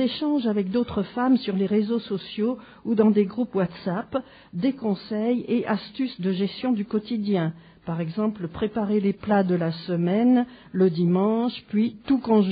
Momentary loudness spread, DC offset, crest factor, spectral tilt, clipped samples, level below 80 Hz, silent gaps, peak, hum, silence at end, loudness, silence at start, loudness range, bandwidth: 9 LU; under 0.1%; 16 dB; -6.5 dB/octave; under 0.1%; -58 dBFS; none; -6 dBFS; none; 0 s; -24 LUFS; 0 s; 4 LU; 5 kHz